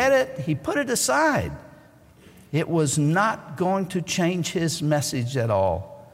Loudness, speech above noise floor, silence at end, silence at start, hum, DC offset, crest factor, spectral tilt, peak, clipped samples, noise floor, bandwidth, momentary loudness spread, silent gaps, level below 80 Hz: -23 LUFS; 28 dB; 0.05 s; 0 s; none; under 0.1%; 14 dB; -4.5 dB/octave; -10 dBFS; under 0.1%; -51 dBFS; 16 kHz; 7 LU; none; -52 dBFS